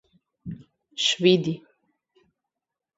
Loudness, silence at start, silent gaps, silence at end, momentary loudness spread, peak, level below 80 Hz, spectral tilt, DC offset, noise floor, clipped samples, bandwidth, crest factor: -22 LUFS; 0.45 s; none; 1.4 s; 22 LU; -4 dBFS; -64 dBFS; -4.5 dB/octave; under 0.1%; -87 dBFS; under 0.1%; 8 kHz; 24 dB